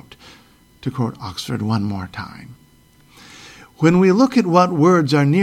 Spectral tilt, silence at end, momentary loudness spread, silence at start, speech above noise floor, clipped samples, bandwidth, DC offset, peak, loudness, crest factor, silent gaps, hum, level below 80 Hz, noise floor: -7 dB/octave; 0 s; 17 LU; 0.85 s; 35 dB; under 0.1%; 14.5 kHz; under 0.1%; 0 dBFS; -17 LUFS; 18 dB; none; none; -54 dBFS; -51 dBFS